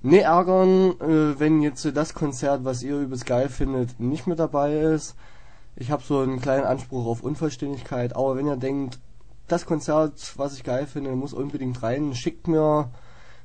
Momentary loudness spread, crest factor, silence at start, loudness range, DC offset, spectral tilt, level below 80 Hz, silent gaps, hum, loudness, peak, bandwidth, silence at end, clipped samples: 11 LU; 22 dB; 0 s; 5 LU; 0.9%; -7 dB/octave; -44 dBFS; none; none; -24 LUFS; -2 dBFS; 9.4 kHz; 0.45 s; under 0.1%